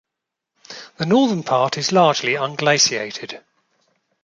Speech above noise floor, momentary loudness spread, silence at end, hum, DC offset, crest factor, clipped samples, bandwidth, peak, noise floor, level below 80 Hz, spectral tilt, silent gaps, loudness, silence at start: 64 dB; 21 LU; 0.85 s; none; under 0.1%; 18 dB; under 0.1%; 11 kHz; -2 dBFS; -83 dBFS; -66 dBFS; -3.5 dB/octave; none; -18 LUFS; 0.7 s